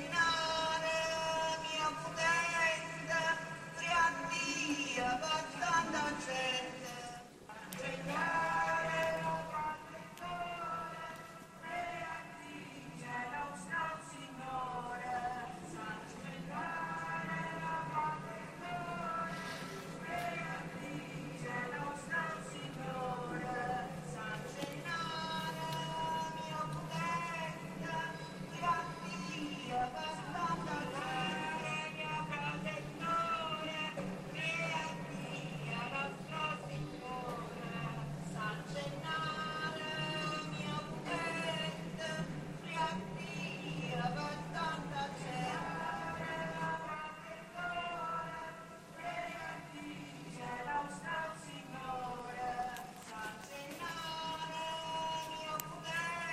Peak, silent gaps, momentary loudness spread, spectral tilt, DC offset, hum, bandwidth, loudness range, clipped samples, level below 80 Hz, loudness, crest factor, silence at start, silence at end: -18 dBFS; none; 11 LU; -4 dB/octave; under 0.1%; none; 16 kHz; 8 LU; under 0.1%; -66 dBFS; -39 LUFS; 22 dB; 0 s; 0 s